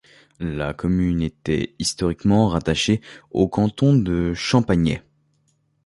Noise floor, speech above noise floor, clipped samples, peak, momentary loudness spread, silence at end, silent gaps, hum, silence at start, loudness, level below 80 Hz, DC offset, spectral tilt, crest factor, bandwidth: -65 dBFS; 45 dB; under 0.1%; -4 dBFS; 8 LU; 0.85 s; none; none; 0.4 s; -21 LUFS; -38 dBFS; under 0.1%; -6 dB/octave; 18 dB; 11.5 kHz